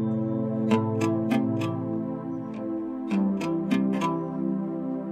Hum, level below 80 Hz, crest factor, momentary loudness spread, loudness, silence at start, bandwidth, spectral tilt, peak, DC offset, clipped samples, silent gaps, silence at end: none; -66 dBFS; 16 dB; 7 LU; -27 LUFS; 0 s; 12.5 kHz; -8 dB/octave; -10 dBFS; under 0.1%; under 0.1%; none; 0 s